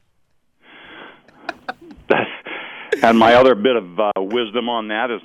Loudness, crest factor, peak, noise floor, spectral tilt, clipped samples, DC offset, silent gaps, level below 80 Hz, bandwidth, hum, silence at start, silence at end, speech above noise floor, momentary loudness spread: -16 LUFS; 18 dB; 0 dBFS; -61 dBFS; -5.5 dB/octave; under 0.1%; under 0.1%; none; -54 dBFS; 13.5 kHz; none; 0.9 s; 0.05 s; 46 dB; 22 LU